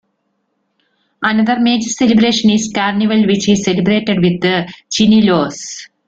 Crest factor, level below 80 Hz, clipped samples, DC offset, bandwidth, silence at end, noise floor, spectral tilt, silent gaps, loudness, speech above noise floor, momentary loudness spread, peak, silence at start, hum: 12 dB; -50 dBFS; under 0.1%; under 0.1%; 8 kHz; 0.2 s; -67 dBFS; -4.5 dB/octave; none; -13 LUFS; 54 dB; 8 LU; -2 dBFS; 1.2 s; none